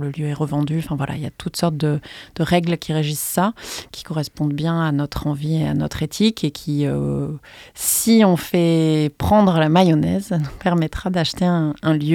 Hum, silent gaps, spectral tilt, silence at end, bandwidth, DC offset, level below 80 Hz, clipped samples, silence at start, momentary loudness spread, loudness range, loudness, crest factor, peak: none; none; -5.5 dB/octave; 0 s; 17.5 kHz; under 0.1%; -44 dBFS; under 0.1%; 0 s; 11 LU; 5 LU; -19 LUFS; 18 dB; 0 dBFS